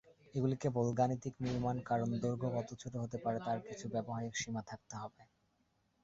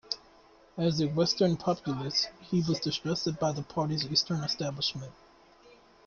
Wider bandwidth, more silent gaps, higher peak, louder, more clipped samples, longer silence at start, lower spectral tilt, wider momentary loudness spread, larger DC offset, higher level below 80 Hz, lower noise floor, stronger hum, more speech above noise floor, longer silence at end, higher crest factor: about the same, 7.8 kHz vs 7.2 kHz; neither; second, -20 dBFS vs -12 dBFS; second, -39 LUFS vs -30 LUFS; neither; first, 0.35 s vs 0.05 s; first, -7 dB/octave vs -5 dB/octave; about the same, 9 LU vs 7 LU; neither; about the same, -66 dBFS vs -62 dBFS; first, -78 dBFS vs -58 dBFS; neither; first, 40 dB vs 28 dB; second, 0.8 s vs 0.95 s; about the same, 18 dB vs 18 dB